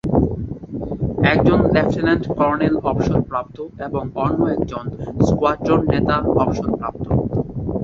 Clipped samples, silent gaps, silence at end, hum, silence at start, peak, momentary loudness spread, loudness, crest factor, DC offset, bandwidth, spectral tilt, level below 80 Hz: under 0.1%; none; 0 s; none; 0.05 s; -2 dBFS; 12 LU; -19 LUFS; 18 dB; under 0.1%; 7.4 kHz; -8 dB/octave; -34 dBFS